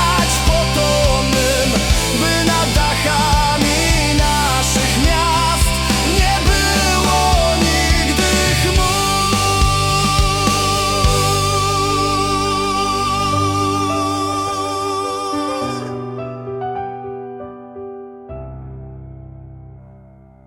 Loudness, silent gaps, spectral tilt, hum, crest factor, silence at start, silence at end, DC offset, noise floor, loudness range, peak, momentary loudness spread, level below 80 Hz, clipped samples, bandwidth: -15 LUFS; none; -3.5 dB/octave; none; 14 dB; 0 s; 0.75 s; under 0.1%; -43 dBFS; 13 LU; -2 dBFS; 16 LU; -24 dBFS; under 0.1%; 18 kHz